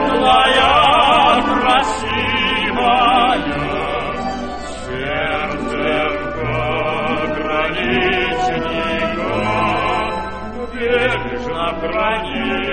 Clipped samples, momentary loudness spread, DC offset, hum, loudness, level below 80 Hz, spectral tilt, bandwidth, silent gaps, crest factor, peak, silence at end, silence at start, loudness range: under 0.1%; 11 LU; 2%; none; -16 LUFS; -36 dBFS; -4.5 dB/octave; 9.2 kHz; none; 16 dB; 0 dBFS; 0 s; 0 s; 7 LU